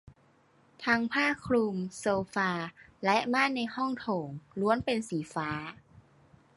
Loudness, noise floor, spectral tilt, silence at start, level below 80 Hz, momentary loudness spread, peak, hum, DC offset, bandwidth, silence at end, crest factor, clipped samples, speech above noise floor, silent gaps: -30 LUFS; -65 dBFS; -5 dB/octave; 0.8 s; -64 dBFS; 9 LU; -10 dBFS; none; under 0.1%; 11.5 kHz; 0.55 s; 22 dB; under 0.1%; 34 dB; none